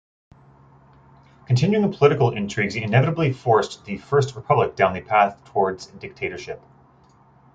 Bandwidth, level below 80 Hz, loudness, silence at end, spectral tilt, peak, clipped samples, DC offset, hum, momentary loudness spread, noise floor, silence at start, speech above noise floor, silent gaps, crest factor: 8 kHz; -56 dBFS; -21 LUFS; 1 s; -7 dB/octave; -2 dBFS; under 0.1%; under 0.1%; none; 14 LU; -54 dBFS; 1.5 s; 34 dB; none; 20 dB